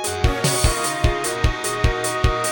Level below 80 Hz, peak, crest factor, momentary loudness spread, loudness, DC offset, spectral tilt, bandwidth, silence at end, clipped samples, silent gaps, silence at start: -24 dBFS; -4 dBFS; 14 dB; 3 LU; -20 LUFS; under 0.1%; -3.5 dB/octave; over 20 kHz; 0 s; under 0.1%; none; 0 s